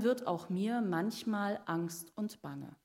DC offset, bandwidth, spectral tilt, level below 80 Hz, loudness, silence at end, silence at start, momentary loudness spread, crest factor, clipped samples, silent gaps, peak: under 0.1%; 16 kHz; -6 dB/octave; -80 dBFS; -37 LUFS; 0.1 s; 0 s; 8 LU; 16 dB; under 0.1%; none; -20 dBFS